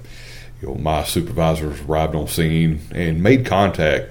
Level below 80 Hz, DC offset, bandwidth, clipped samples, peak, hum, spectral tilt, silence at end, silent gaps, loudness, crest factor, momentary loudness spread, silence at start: -32 dBFS; under 0.1%; 19.5 kHz; under 0.1%; 0 dBFS; none; -6 dB/octave; 0 s; none; -19 LUFS; 18 dB; 16 LU; 0 s